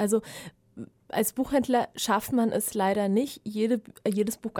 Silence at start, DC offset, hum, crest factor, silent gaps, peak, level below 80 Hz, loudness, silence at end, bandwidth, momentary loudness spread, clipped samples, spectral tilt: 0 s; under 0.1%; none; 16 dB; none; -12 dBFS; -60 dBFS; -27 LUFS; 0 s; 19 kHz; 18 LU; under 0.1%; -4.5 dB/octave